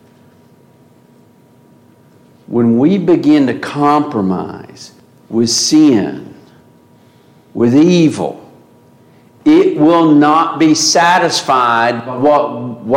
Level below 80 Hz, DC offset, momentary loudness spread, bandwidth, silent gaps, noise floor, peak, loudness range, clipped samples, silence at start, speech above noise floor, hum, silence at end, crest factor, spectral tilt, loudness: -58 dBFS; under 0.1%; 12 LU; 14 kHz; none; -46 dBFS; -2 dBFS; 5 LU; under 0.1%; 2.5 s; 35 dB; none; 0 s; 12 dB; -4.5 dB/octave; -11 LUFS